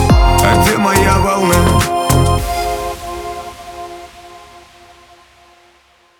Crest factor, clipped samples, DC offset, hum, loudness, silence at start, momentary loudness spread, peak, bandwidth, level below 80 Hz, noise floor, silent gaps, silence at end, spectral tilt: 14 dB; under 0.1%; under 0.1%; none; -13 LUFS; 0 s; 19 LU; 0 dBFS; over 20 kHz; -22 dBFS; -51 dBFS; none; 1.6 s; -5 dB/octave